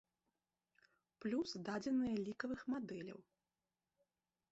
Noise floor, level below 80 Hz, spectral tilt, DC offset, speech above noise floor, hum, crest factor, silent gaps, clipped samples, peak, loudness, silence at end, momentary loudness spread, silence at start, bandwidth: under -90 dBFS; -78 dBFS; -5 dB/octave; under 0.1%; over 48 dB; none; 18 dB; none; under 0.1%; -28 dBFS; -43 LUFS; 1.3 s; 11 LU; 1.2 s; 8 kHz